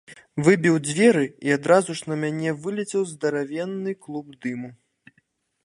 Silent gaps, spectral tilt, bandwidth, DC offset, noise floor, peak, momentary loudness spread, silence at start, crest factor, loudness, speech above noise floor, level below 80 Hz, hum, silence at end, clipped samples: none; -5.5 dB/octave; 11.5 kHz; under 0.1%; -68 dBFS; -2 dBFS; 14 LU; 0.1 s; 20 dB; -23 LUFS; 45 dB; -68 dBFS; none; 0.9 s; under 0.1%